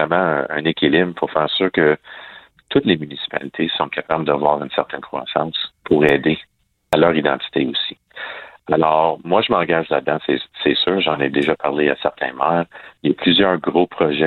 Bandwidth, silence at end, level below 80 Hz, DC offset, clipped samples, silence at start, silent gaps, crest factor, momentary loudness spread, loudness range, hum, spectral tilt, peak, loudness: 10.5 kHz; 0 s; -54 dBFS; under 0.1%; under 0.1%; 0 s; none; 18 dB; 10 LU; 2 LU; none; -7 dB/octave; 0 dBFS; -18 LUFS